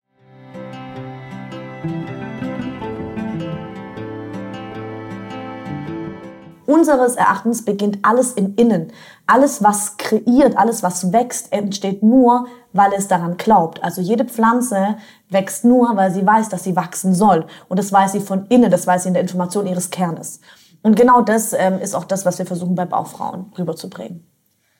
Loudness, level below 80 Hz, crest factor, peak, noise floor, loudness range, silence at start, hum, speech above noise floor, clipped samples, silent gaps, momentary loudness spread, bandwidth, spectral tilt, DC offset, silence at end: -17 LUFS; -56 dBFS; 14 dB; -4 dBFS; -44 dBFS; 12 LU; 0.4 s; none; 28 dB; under 0.1%; none; 17 LU; 17 kHz; -5.5 dB/octave; under 0.1%; 0.6 s